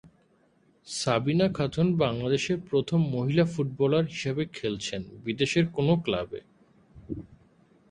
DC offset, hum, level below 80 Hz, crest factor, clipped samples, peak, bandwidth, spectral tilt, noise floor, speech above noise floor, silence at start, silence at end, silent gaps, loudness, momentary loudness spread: under 0.1%; none; -56 dBFS; 18 dB; under 0.1%; -10 dBFS; 11 kHz; -6 dB/octave; -65 dBFS; 38 dB; 0.05 s; 0.55 s; none; -27 LUFS; 12 LU